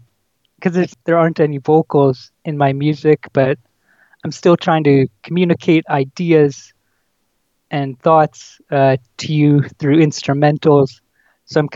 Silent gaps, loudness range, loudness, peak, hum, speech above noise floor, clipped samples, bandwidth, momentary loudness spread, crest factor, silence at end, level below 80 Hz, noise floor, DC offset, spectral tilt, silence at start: none; 2 LU; -15 LUFS; 0 dBFS; none; 53 dB; under 0.1%; 7.6 kHz; 9 LU; 16 dB; 0 s; -62 dBFS; -67 dBFS; under 0.1%; -7.5 dB/octave; 0.6 s